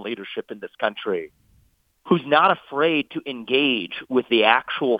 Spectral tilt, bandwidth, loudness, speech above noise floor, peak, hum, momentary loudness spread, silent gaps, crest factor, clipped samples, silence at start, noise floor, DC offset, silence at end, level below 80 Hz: -7 dB/octave; 5 kHz; -21 LUFS; 40 dB; -2 dBFS; none; 14 LU; none; 22 dB; under 0.1%; 0 s; -61 dBFS; under 0.1%; 0 s; -68 dBFS